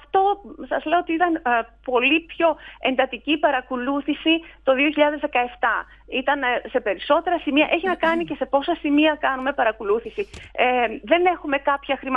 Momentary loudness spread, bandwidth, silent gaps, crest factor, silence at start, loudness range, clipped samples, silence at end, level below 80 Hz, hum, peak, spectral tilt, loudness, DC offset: 6 LU; 7.8 kHz; none; 18 dB; 0.15 s; 1 LU; under 0.1%; 0 s; -52 dBFS; none; -4 dBFS; -5.5 dB/octave; -21 LUFS; under 0.1%